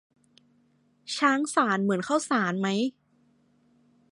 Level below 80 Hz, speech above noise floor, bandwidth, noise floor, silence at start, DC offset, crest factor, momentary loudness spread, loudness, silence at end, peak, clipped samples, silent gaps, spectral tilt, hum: -80 dBFS; 40 dB; 11.5 kHz; -66 dBFS; 1.05 s; under 0.1%; 22 dB; 8 LU; -26 LUFS; 1.25 s; -8 dBFS; under 0.1%; none; -4.5 dB/octave; none